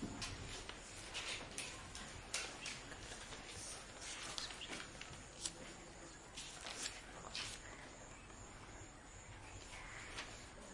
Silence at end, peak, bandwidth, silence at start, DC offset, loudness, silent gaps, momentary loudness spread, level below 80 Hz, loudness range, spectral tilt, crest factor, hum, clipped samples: 0 s; -22 dBFS; 11.5 kHz; 0 s; under 0.1%; -49 LUFS; none; 10 LU; -62 dBFS; 4 LU; -2 dB/octave; 30 dB; none; under 0.1%